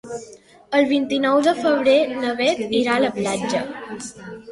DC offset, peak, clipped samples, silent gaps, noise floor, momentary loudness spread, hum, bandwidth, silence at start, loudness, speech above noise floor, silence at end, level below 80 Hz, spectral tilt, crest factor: under 0.1%; -4 dBFS; under 0.1%; none; -44 dBFS; 16 LU; none; 11.5 kHz; 0.05 s; -19 LUFS; 25 dB; 0 s; -60 dBFS; -4 dB/octave; 16 dB